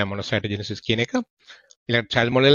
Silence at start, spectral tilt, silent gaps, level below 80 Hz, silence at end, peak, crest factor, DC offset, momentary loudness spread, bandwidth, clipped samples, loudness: 0 s; -5.5 dB/octave; 1.30-1.37 s, 1.76-1.86 s; -56 dBFS; 0 s; -2 dBFS; 20 dB; under 0.1%; 10 LU; 7.4 kHz; under 0.1%; -23 LUFS